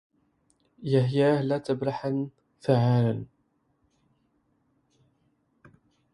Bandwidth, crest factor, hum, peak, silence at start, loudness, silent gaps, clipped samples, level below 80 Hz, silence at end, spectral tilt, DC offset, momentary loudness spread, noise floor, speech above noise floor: 10.5 kHz; 20 dB; none; -8 dBFS; 0.8 s; -26 LUFS; none; under 0.1%; -66 dBFS; 2.9 s; -8.5 dB/octave; under 0.1%; 14 LU; -71 dBFS; 47 dB